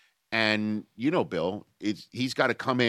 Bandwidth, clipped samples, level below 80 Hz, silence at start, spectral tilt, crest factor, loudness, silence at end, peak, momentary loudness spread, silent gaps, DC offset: 13.5 kHz; under 0.1%; -68 dBFS; 0.3 s; -5.5 dB/octave; 22 dB; -28 LUFS; 0 s; -6 dBFS; 8 LU; none; under 0.1%